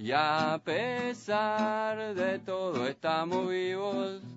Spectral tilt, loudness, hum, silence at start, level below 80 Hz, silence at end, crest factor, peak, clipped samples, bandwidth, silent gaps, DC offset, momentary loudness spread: -3 dB/octave; -31 LUFS; none; 0 s; -76 dBFS; 0 s; 18 dB; -12 dBFS; under 0.1%; 7.6 kHz; none; under 0.1%; 5 LU